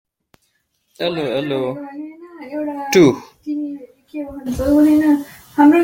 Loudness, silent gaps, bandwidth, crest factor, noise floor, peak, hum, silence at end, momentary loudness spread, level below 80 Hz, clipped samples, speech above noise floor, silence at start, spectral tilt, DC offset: -17 LUFS; none; 16.5 kHz; 16 dB; -66 dBFS; -2 dBFS; none; 0 s; 19 LU; -44 dBFS; under 0.1%; 50 dB; 1 s; -5.5 dB/octave; under 0.1%